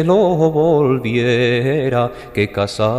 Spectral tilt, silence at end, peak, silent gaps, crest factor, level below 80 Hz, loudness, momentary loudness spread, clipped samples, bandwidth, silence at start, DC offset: -7 dB/octave; 0 s; -2 dBFS; none; 12 dB; -46 dBFS; -16 LUFS; 6 LU; under 0.1%; 15 kHz; 0 s; under 0.1%